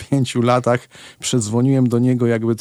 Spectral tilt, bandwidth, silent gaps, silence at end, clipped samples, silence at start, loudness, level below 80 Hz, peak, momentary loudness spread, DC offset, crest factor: -6 dB/octave; 13 kHz; none; 0 s; under 0.1%; 0 s; -18 LUFS; -60 dBFS; -4 dBFS; 5 LU; under 0.1%; 14 dB